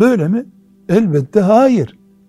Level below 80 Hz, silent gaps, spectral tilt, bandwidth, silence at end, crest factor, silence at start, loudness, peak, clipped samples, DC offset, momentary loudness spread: -52 dBFS; none; -8 dB/octave; 12.5 kHz; 0.4 s; 14 dB; 0 s; -13 LUFS; 0 dBFS; under 0.1%; under 0.1%; 9 LU